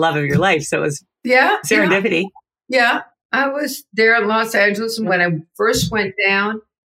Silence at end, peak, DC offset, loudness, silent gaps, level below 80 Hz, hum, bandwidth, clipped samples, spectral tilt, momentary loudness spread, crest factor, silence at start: 0.35 s; -2 dBFS; under 0.1%; -16 LUFS; 3.25-3.29 s; -48 dBFS; none; 16 kHz; under 0.1%; -4 dB/octave; 9 LU; 14 dB; 0 s